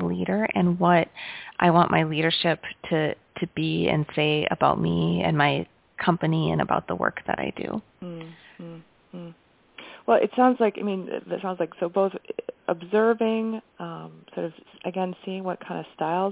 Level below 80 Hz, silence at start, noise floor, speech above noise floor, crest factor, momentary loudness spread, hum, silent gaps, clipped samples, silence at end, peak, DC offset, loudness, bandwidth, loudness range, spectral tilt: -56 dBFS; 0 s; -52 dBFS; 27 dB; 20 dB; 18 LU; none; none; under 0.1%; 0 s; -6 dBFS; under 0.1%; -25 LUFS; 4 kHz; 6 LU; -10.5 dB/octave